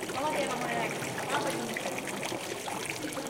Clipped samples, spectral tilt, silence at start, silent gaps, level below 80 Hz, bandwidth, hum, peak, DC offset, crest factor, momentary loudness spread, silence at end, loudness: under 0.1%; -3 dB/octave; 0 s; none; -64 dBFS; 17 kHz; none; -16 dBFS; under 0.1%; 18 dB; 4 LU; 0 s; -33 LUFS